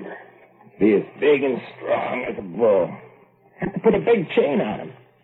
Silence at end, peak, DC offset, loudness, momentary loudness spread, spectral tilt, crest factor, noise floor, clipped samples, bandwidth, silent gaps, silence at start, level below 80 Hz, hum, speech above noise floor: 0.3 s; -6 dBFS; under 0.1%; -21 LUFS; 14 LU; -9.5 dB/octave; 16 dB; -52 dBFS; under 0.1%; 4.1 kHz; none; 0 s; -56 dBFS; none; 32 dB